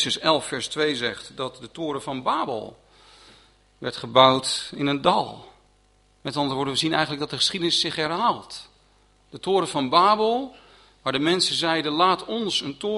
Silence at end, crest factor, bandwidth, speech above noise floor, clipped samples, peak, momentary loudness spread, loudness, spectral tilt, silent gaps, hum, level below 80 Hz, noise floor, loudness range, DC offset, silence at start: 0 s; 24 dB; 11.5 kHz; 37 dB; under 0.1%; -2 dBFS; 15 LU; -23 LUFS; -3.5 dB/octave; none; none; -60 dBFS; -60 dBFS; 5 LU; under 0.1%; 0 s